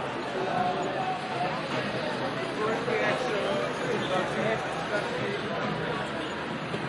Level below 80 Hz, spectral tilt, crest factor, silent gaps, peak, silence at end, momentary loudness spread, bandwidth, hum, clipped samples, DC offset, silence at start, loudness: -60 dBFS; -5 dB/octave; 14 dB; none; -14 dBFS; 0 s; 4 LU; 11.5 kHz; none; under 0.1%; under 0.1%; 0 s; -29 LUFS